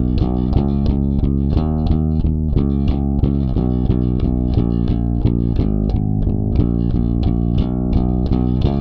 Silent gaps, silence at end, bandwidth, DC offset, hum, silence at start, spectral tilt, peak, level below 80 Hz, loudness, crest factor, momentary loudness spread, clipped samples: none; 0 s; 5.2 kHz; under 0.1%; none; 0 s; -11.5 dB/octave; -2 dBFS; -20 dBFS; -18 LUFS; 14 dB; 1 LU; under 0.1%